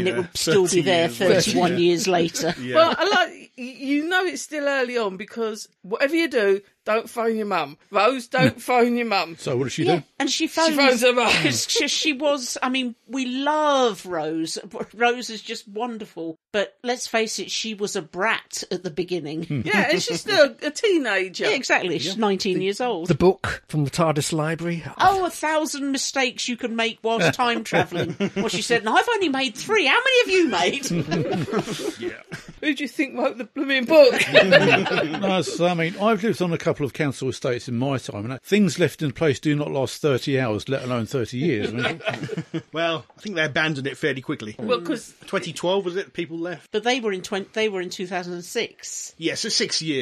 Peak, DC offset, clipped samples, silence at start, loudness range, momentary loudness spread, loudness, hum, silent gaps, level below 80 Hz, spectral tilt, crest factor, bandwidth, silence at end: 0 dBFS; under 0.1%; under 0.1%; 0 s; 7 LU; 11 LU; -22 LUFS; none; none; -56 dBFS; -4 dB/octave; 22 dB; 14 kHz; 0 s